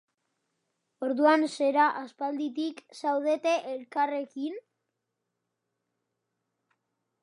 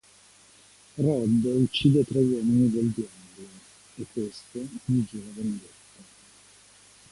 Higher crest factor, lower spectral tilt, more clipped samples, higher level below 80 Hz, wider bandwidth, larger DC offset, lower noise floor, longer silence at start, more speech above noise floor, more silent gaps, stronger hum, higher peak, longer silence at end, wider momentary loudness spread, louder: about the same, 22 dB vs 20 dB; second, -3 dB/octave vs -7 dB/octave; neither; second, -90 dBFS vs -58 dBFS; about the same, 11 kHz vs 11.5 kHz; neither; first, -84 dBFS vs -56 dBFS; about the same, 1 s vs 0.95 s; first, 56 dB vs 31 dB; neither; second, none vs 50 Hz at -55 dBFS; about the same, -10 dBFS vs -8 dBFS; first, 2.65 s vs 1.5 s; second, 13 LU vs 22 LU; about the same, -28 LUFS vs -26 LUFS